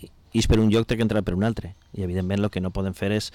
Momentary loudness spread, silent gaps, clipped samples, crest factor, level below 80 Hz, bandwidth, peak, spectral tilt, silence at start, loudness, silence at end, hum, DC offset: 10 LU; none; under 0.1%; 12 dB; -36 dBFS; 15.5 kHz; -12 dBFS; -6.5 dB/octave; 0 s; -24 LUFS; 0.05 s; none; under 0.1%